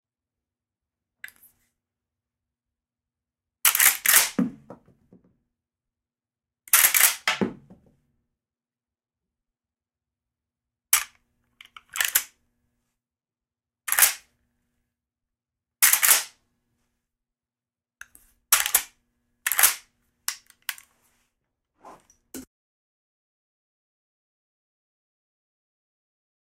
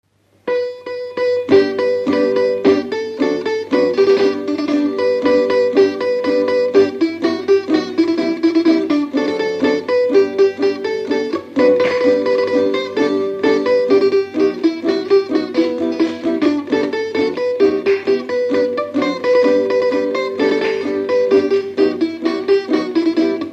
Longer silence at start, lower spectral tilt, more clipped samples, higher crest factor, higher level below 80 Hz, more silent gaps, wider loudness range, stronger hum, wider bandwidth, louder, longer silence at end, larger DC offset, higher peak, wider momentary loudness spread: first, 3.65 s vs 0.45 s; second, 0 dB/octave vs -5.5 dB/octave; neither; first, 26 dB vs 16 dB; second, -70 dBFS vs -62 dBFS; neither; first, 9 LU vs 2 LU; neither; first, 16.5 kHz vs 8 kHz; second, -20 LUFS vs -16 LUFS; first, 4.05 s vs 0 s; neither; second, -4 dBFS vs 0 dBFS; first, 22 LU vs 6 LU